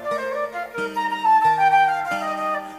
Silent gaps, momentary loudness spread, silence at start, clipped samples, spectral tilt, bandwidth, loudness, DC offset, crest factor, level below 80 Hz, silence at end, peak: none; 11 LU; 0 s; under 0.1%; -3.5 dB/octave; 15.5 kHz; -20 LUFS; under 0.1%; 14 dB; -64 dBFS; 0 s; -8 dBFS